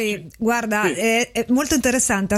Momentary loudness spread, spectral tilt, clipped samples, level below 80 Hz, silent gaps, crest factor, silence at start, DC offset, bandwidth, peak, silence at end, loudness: 4 LU; -3 dB/octave; under 0.1%; -46 dBFS; none; 16 dB; 0 s; under 0.1%; 15 kHz; -4 dBFS; 0 s; -19 LUFS